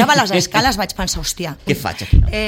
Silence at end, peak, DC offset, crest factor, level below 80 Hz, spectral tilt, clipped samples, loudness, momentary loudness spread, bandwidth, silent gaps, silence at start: 0 s; 0 dBFS; under 0.1%; 16 dB; -22 dBFS; -4 dB/octave; under 0.1%; -17 LUFS; 7 LU; 17 kHz; none; 0 s